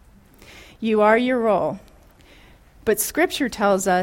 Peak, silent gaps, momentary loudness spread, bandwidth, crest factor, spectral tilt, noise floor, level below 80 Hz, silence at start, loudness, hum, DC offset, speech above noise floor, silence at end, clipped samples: -4 dBFS; none; 11 LU; 16.5 kHz; 18 dB; -4 dB/octave; -50 dBFS; -52 dBFS; 0.55 s; -20 LUFS; none; under 0.1%; 30 dB; 0 s; under 0.1%